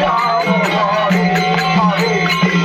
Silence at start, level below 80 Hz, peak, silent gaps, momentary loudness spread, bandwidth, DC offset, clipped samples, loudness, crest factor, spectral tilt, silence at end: 0 s; -46 dBFS; -2 dBFS; none; 1 LU; 15.5 kHz; under 0.1%; under 0.1%; -14 LUFS; 12 dB; -5.5 dB/octave; 0 s